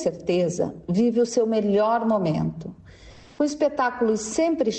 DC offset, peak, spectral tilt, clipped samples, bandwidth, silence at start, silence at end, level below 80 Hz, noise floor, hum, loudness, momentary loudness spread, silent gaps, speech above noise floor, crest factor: under 0.1%; -10 dBFS; -6 dB/octave; under 0.1%; 9 kHz; 0 s; 0 s; -56 dBFS; -47 dBFS; none; -23 LUFS; 6 LU; none; 24 dB; 12 dB